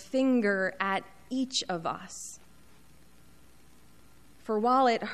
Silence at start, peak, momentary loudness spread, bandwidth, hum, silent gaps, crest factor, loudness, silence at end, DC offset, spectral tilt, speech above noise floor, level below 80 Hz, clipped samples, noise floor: 0 s; -12 dBFS; 17 LU; 13.5 kHz; none; none; 18 dB; -29 LUFS; 0 s; 0.2%; -4 dB/octave; 31 dB; -66 dBFS; under 0.1%; -59 dBFS